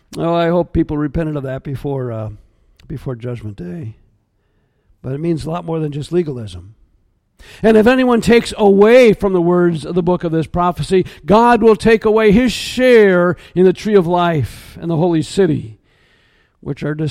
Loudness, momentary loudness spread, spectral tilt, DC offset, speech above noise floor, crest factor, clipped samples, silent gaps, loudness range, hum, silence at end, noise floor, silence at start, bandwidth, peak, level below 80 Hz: -14 LUFS; 18 LU; -6.5 dB/octave; under 0.1%; 47 dB; 14 dB; under 0.1%; none; 14 LU; none; 0 s; -61 dBFS; 0.1 s; 15 kHz; 0 dBFS; -38 dBFS